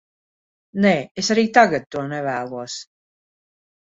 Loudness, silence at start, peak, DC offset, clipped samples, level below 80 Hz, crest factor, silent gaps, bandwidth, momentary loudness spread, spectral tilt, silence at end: -19 LUFS; 0.75 s; 0 dBFS; under 0.1%; under 0.1%; -62 dBFS; 22 dB; 1.11-1.15 s; 7.8 kHz; 16 LU; -4.5 dB/octave; 1.05 s